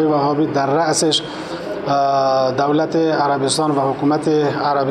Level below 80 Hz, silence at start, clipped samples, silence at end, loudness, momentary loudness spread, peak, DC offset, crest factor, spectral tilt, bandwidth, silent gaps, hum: -56 dBFS; 0 s; under 0.1%; 0 s; -17 LUFS; 4 LU; -4 dBFS; under 0.1%; 12 dB; -4.5 dB/octave; 12.5 kHz; none; none